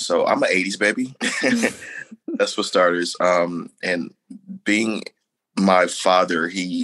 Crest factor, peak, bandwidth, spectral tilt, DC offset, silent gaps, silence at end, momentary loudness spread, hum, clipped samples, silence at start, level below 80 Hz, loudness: 18 dB; -2 dBFS; 12.5 kHz; -4 dB/octave; under 0.1%; none; 0 s; 14 LU; none; under 0.1%; 0 s; -70 dBFS; -20 LUFS